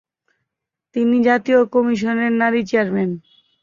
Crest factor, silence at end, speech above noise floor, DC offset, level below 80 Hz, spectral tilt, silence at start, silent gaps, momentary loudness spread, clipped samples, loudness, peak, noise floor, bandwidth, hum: 16 dB; 0.45 s; 66 dB; under 0.1%; -62 dBFS; -7 dB/octave; 0.95 s; none; 8 LU; under 0.1%; -18 LUFS; -2 dBFS; -82 dBFS; 7.2 kHz; none